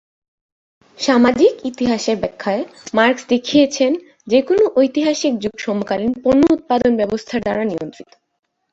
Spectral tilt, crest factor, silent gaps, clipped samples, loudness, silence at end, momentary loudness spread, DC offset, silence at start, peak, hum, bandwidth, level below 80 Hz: -4.5 dB/octave; 16 dB; none; under 0.1%; -17 LUFS; 0.8 s; 9 LU; under 0.1%; 1 s; -2 dBFS; none; 8 kHz; -50 dBFS